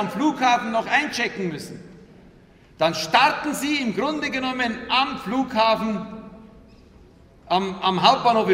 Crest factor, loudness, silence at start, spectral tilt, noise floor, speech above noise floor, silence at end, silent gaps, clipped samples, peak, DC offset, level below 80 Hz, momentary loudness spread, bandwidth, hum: 22 dB; -21 LUFS; 0 s; -4 dB/octave; -51 dBFS; 29 dB; 0 s; none; under 0.1%; 0 dBFS; under 0.1%; -56 dBFS; 12 LU; 16 kHz; none